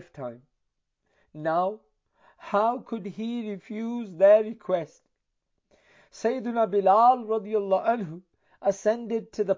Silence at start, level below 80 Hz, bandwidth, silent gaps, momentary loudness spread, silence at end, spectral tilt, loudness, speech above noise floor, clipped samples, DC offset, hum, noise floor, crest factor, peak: 0 s; -76 dBFS; 7.6 kHz; none; 17 LU; 0 s; -6.5 dB/octave; -25 LUFS; 53 dB; under 0.1%; under 0.1%; none; -78 dBFS; 18 dB; -10 dBFS